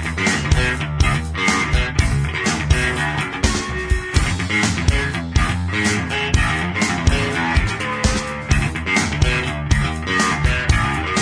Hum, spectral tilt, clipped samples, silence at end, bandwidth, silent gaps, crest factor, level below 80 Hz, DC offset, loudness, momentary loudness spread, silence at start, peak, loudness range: none; -4.5 dB/octave; under 0.1%; 0 s; 10.5 kHz; none; 16 dB; -24 dBFS; under 0.1%; -19 LUFS; 3 LU; 0 s; -2 dBFS; 1 LU